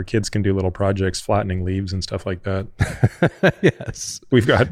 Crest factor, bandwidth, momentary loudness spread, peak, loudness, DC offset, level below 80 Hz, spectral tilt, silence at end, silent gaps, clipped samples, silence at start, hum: 18 dB; 13.5 kHz; 9 LU; -2 dBFS; -21 LUFS; under 0.1%; -40 dBFS; -6 dB/octave; 0 s; none; under 0.1%; 0 s; none